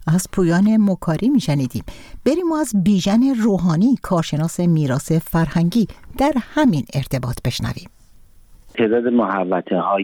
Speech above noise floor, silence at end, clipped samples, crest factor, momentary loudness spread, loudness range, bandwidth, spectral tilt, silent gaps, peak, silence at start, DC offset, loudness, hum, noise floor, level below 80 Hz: 28 dB; 0 s; under 0.1%; 14 dB; 8 LU; 4 LU; 19 kHz; -6.5 dB/octave; none; -4 dBFS; 0 s; under 0.1%; -18 LUFS; none; -46 dBFS; -40 dBFS